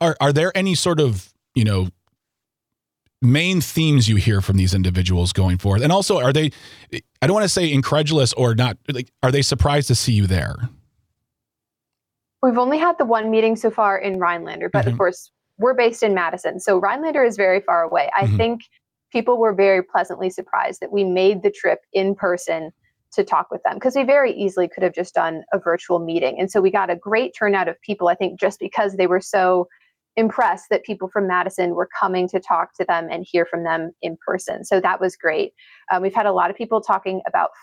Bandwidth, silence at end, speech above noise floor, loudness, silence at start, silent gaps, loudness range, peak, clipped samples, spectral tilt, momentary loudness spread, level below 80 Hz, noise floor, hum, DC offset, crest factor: 16 kHz; 0.15 s; 65 dB; -19 LUFS; 0 s; none; 3 LU; -6 dBFS; under 0.1%; -5.5 dB/octave; 7 LU; -48 dBFS; -84 dBFS; none; under 0.1%; 14 dB